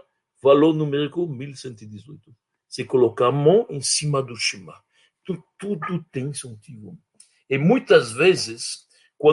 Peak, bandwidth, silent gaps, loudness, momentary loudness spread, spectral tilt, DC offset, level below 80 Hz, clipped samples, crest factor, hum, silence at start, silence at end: -2 dBFS; 11.5 kHz; none; -21 LUFS; 22 LU; -5 dB/octave; under 0.1%; -66 dBFS; under 0.1%; 20 dB; none; 0.45 s; 0 s